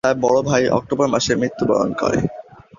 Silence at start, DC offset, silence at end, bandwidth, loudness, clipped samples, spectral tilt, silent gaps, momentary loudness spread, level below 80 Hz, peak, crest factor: 0.05 s; under 0.1%; 0.35 s; 7.6 kHz; -18 LUFS; under 0.1%; -5 dB/octave; none; 5 LU; -46 dBFS; -2 dBFS; 16 dB